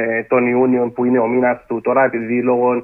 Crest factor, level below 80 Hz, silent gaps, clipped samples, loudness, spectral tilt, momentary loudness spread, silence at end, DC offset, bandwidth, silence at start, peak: 14 dB; -58 dBFS; none; under 0.1%; -16 LUFS; -11 dB/octave; 3 LU; 0 s; under 0.1%; 2.9 kHz; 0 s; -2 dBFS